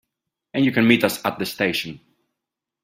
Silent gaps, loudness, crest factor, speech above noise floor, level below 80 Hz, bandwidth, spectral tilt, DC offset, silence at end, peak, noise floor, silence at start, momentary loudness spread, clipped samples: none; -20 LUFS; 22 dB; 64 dB; -62 dBFS; 16 kHz; -5 dB/octave; under 0.1%; 0.85 s; -2 dBFS; -84 dBFS; 0.55 s; 12 LU; under 0.1%